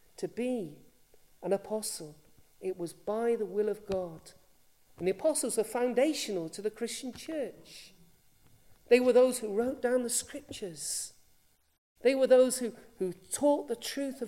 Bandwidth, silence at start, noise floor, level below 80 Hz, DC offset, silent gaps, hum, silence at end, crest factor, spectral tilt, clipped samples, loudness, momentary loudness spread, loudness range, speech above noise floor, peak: 16 kHz; 0.2 s; -67 dBFS; -68 dBFS; under 0.1%; 11.78-11.95 s; none; 0 s; 22 dB; -3.5 dB/octave; under 0.1%; -31 LUFS; 17 LU; 6 LU; 36 dB; -10 dBFS